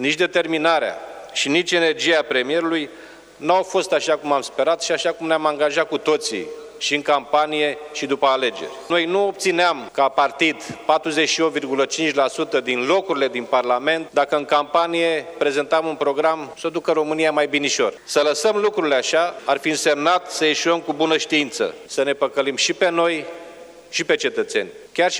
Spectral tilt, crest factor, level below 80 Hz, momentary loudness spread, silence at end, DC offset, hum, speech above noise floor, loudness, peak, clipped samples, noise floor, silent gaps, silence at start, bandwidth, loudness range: -2.5 dB/octave; 18 dB; -66 dBFS; 7 LU; 0 s; under 0.1%; none; 21 dB; -20 LUFS; -2 dBFS; under 0.1%; -41 dBFS; none; 0 s; 19.5 kHz; 2 LU